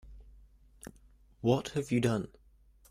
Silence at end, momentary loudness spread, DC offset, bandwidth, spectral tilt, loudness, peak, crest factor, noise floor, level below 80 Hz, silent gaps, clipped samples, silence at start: 0.65 s; 22 LU; under 0.1%; 15.5 kHz; -6.5 dB/octave; -32 LUFS; -14 dBFS; 22 dB; -62 dBFS; -56 dBFS; none; under 0.1%; 0.05 s